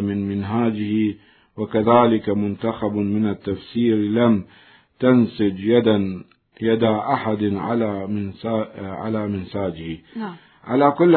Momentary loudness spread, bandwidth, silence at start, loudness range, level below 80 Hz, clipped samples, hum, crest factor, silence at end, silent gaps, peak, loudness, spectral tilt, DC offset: 13 LU; 4.5 kHz; 0 s; 5 LU; -58 dBFS; under 0.1%; none; 18 dB; 0 s; none; -2 dBFS; -21 LUFS; -12 dB/octave; under 0.1%